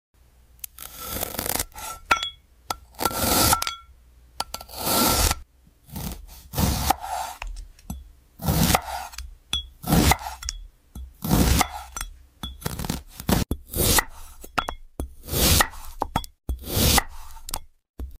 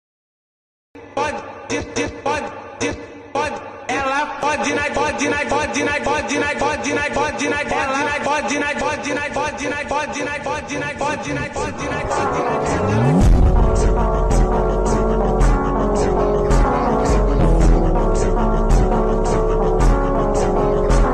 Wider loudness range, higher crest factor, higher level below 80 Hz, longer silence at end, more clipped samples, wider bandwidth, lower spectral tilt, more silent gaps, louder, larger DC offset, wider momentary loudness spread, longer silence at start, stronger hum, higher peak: about the same, 3 LU vs 5 LU; first, 20 dB vs 10 dB; second, -34 dBFS vs -22 dBFS; about the same, 0.05 s vs 0 s; neither; first, 16 kHz vs 10 kHz; second, -3.5 dB/octave vs -5.5 dB/octave; first, 17.89-17.94 s vs none; second, -24 LUFS vs -19 LUFS; neither; first, 21 LU vs 7 LU; second, 0.8 s vs 0.95 s; neither; about the same, -6 dBFS vs -6 dBFS